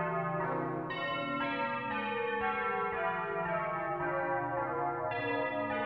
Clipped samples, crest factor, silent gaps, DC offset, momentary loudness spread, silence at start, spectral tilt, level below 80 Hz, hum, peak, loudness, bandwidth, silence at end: under 0.1%; 12 dB; none; under 0.1%; 2 LU; 0 s; -8 dB/octave; -64 dBFS; none; -22 dBFS; -34 LUFS; 5.8 kHz; 0 s